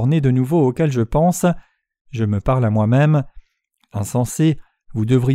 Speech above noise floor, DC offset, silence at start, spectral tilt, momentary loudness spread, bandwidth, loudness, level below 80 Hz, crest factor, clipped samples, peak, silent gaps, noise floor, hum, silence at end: 48 dB; under 0.1%; 0 s; -7.5 dB/octave; 13 LU; 15.5 kHz; -18 LUFS; -40 dBFS; 14 dB; under 0.1%; -4 dBFS; 2.01-2.05 s; -64 dBFS; none; 0 s